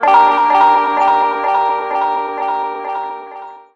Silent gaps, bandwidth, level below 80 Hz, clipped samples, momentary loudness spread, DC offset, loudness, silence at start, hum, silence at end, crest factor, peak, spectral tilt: none; 7.4 kHz; -62 dBFS; under 0.1%; 15 LU; under 0.1%; -14 LUFS; 0 s; none; 0.15 s; 14 dB; 0 dBFS; -3.5 dB/octave